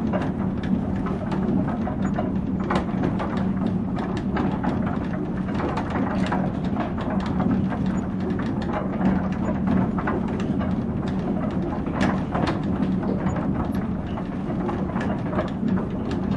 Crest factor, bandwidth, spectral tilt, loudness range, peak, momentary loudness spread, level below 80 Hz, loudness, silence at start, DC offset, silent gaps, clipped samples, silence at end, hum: 16 dB; 7.8 kHz; -8.5 dB/octave; 1 LU; -8 dBFS; 3 LU; -40 dBFS; -25 LUFS; 0 s; under 0.1%; none; under 0.1%; 0 s; none